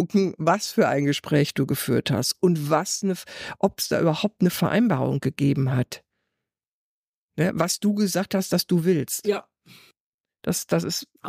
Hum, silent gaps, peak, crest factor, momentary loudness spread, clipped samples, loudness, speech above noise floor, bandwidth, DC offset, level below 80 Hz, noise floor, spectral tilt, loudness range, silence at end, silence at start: none; 6.67-7.29 s, 10.00-10.24 s; -8 dBFS; 16 dB; 7 LU; under 0.1%; -23 LUFS; over 67 dB; 15.5 kHz; under 0.1%; -62 dBFS; under -90 dBFS; -5 dB/octave; 3 LU; 0 s; 0 s